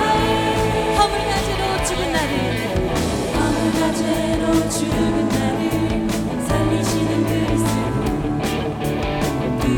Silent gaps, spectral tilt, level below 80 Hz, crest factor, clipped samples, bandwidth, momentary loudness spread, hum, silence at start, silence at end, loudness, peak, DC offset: none; -5 dB/octave; -32 dBFS; 16 dB; under 0.1%; 19 kHz; 4 LU; none; 0 s; 0 s; -20 LUFS; -2 dBFS; under 0.1%